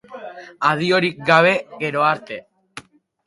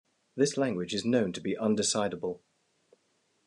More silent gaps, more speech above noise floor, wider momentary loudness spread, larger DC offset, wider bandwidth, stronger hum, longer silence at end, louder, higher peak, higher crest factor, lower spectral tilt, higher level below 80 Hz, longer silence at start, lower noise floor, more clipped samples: neither; second, 24 dB vs 44 dB; first, 25 LU vs 10 LU; neither; about the same, 11.5 kHz vs 11 kHz; neither; second, 0.45 s vs 1.1 s; first, -18 LUFS vs -30 LUFS; first, 0 dBFS vs -12 dBFS; about the same, 20 dB vs 18 dB; first, -5.5 dB/octave vs -4 dB/octave; first, -64 dBFS vs -74 dBFS; second, 0.1 s vs 0.35 s; second, -42 dBFS vs -73 dBFS; neither